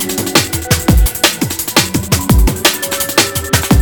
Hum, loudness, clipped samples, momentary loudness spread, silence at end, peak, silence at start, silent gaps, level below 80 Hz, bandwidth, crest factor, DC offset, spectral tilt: none; -12 LUFS; under 0.1%; 3 LU; 0 s; 0 dBFS; 0 s; none; -18 dBFS; over 20 kHz; 12 dB; under 0.1%; -3.5 dB/octave